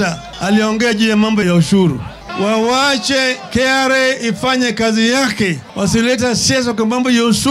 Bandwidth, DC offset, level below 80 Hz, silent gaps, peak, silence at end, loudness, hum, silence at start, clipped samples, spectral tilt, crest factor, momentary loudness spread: 14.5 kHz; under 0.1%; -42 dBFS; none; -2 dBFS; 0 s; -14 LUFS; none; 0 s; under 0.1%; -4 dB/octave; 12 dB; 5 LU